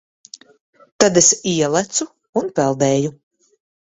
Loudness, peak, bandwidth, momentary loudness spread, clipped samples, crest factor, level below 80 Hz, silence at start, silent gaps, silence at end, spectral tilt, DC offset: -17 LUFS; 0 dBFS; 8.2 kHz; 12 LU; under 0.1%; 20 dB; -58 dBFS; 1 s; 2.29-2.33 s; 0.75 s; -3.5 dB/octave; under 0.1%